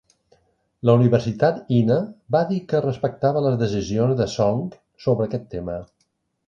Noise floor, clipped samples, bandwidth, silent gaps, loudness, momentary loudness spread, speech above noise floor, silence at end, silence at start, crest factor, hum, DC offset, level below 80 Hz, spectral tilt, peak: -70 dBFS; under 0.1%; 7.4 kHz; none; -21 LUFS; 11 LU; 50 dB; 0.65 s; 0.85 s; 18 dB; none; under 0.1%; -50 dBFS; -8 dB/octave; -4 dBFS